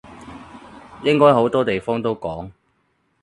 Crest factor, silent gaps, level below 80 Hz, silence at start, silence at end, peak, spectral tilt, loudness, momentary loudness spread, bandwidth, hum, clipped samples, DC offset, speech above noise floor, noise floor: 20 dB; none; -52 dBFS; 0.1 s; 0.7 s; 0 dBFS; -7 dB/octave; -18 LUFS; 25 LU; 10.5 kHz; none; under 0.1%; under 0.1%; 49 dB; -66 dBFS